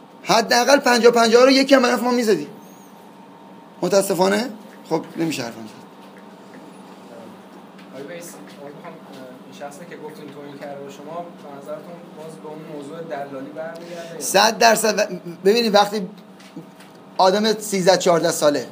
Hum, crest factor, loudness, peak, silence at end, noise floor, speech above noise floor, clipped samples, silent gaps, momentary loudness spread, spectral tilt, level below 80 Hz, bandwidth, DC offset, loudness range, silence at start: none; 20 dB; -17 LUFS; 0 dBFS; 0 s; -43 dBFS; 24 dB; under 0.1%; none; 25 LU; -3.5 dB/octave; -76 dBFS; 15.5 kHz; under 0.1%; 20 LU; 0.25 s